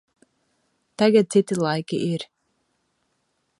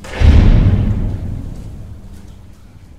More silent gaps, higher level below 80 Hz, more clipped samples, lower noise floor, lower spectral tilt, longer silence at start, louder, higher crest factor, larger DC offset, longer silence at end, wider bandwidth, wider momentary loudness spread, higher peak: neither; second, -70 dBFS vs -16 dBFS; neither; first, -72 dBFS vs -38 dBFS; second, -6 dB/octave vs -8 dB/octave; first, 1 s vs 0.05 s; second, -21 LUFS vs -14 LUFS; first, 20 dB vs 14 dB; second, under 0.1% vs 0.8%; first, 1.35 s vs 0.7 s; first, 11.5 kHz vs 8.2 kHz; second, 11 LU vs 23 LU; second, -6 dBFS vs 0 dBFS